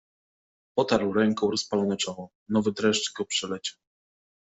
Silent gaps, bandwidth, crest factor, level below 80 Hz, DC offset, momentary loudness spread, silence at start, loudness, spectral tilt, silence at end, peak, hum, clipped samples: 2.35-2.46 s; 8.2 kHz; 18 dB; -64 dBFS; under 0.1%; 8 LU; 0.75 s; -27 LUFS; -4 dB/octave; 0.75 s; -8 dBFS; none; under 0.1%